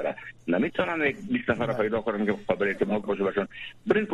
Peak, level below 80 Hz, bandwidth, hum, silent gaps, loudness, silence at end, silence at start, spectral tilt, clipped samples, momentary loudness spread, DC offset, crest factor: -8 dBFS; -58 dBFS; 10.5 kHz; none; none; -27 LUFS; 0 s; 0 s; -7.5 dB/octave; under 0.1%; 6 LU; under 0.1%; 20 dB